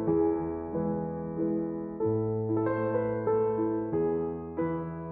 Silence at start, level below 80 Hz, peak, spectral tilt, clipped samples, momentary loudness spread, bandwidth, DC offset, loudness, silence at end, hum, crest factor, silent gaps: 0 s; -56 dBFS; -16 dBFS; -10.5 dB/octave; under 0.1%; 6 LU; 3.2 kHz; under 0.1%; -30 LUFS; 0 s; none; 14 dB; none